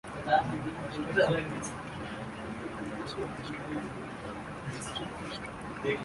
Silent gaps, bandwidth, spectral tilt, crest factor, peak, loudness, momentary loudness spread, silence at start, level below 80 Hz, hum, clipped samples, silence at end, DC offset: none; 11.5 kHz; -5 dB/octave; 22 dB; -12 dBFS; -34 LUFS; 12 LU; 0.05 s; -56 dBFS; none; under 0.1%; 0 s; under 0.1%